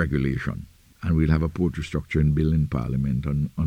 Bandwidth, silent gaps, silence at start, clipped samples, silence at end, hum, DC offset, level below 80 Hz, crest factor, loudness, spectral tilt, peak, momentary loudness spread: 9 kHz; none; 0 s; under 0.1%; 0 s; none; under 0.1%; -34 dBFS; 16 dB; -24 LUFS; -8.5 dB/octave; -8 dBFS; 9 LU